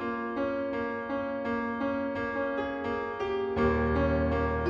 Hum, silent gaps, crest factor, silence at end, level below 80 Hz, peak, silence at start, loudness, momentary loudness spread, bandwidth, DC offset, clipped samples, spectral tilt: none; none; 14 dB; 0 s; -44 dBFS; -16 dBFS; 0 s; -30 LUFS; 6 LU; 7.2 kHz; under 0.1%; under 0.1%; -8.5 dB/octave